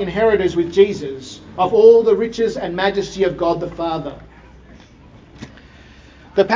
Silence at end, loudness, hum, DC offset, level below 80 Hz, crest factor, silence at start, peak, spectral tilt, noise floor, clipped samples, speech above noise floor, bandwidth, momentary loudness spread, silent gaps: 0 s; -16 LUFS; none; under 0.1%; -44 dBFS; 18 dB; 0 s; 0 dBFS; -6 dB/octave; -44 dBFS; under 0.1%; 28 dB; 7.6 kHz; 18 LU; none